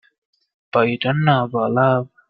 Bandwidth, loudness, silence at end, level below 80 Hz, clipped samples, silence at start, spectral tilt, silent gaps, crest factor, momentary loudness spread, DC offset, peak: 4.9 kHz; -18 LUFS; 0.25 s; -58 dBFS; under 0.1%; 0.75 s; -10 dB/octave; none; 18 dB; 3 LU; under 0.1%; -2 dBFS